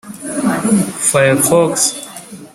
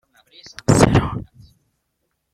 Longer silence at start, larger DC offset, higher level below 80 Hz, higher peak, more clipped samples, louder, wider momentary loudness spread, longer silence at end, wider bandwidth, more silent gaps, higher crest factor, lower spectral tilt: second, 0.05 s vs 0.7 s; neither; second, -54 dBFS vs -36 dBFS; about the same, 0 dBFS vs -2 dBFS; neither; first, -13 LUFS vs -17 LUFS; second, 16 LU vs 19 LU; second, 0.05 s vs 1.1 s; first, 16 kHz vs 13.5 kHz; neither; second, 14 dB vs 20 dB; second, -4 dB/octave vs -6 dB/octave